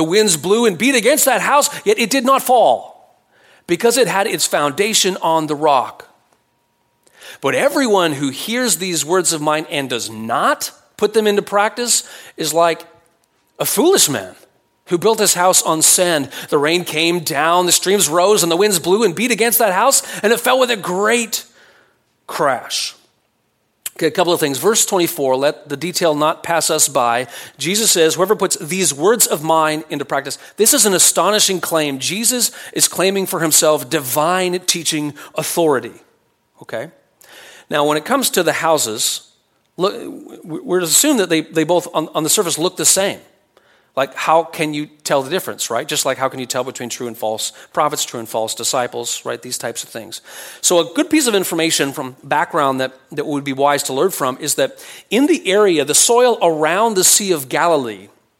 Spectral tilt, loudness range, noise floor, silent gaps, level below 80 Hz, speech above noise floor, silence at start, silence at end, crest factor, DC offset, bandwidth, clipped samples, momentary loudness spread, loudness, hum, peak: -2 dB/octave; 6 LU; -65 dBFS; none; -68 dBFS; 48 dB; 0 s; 0.35 s; 16 dB; under 0.1%; 17 kHz; under 0.1%; 11 LU; -15 LUFS; none; 0 dBFS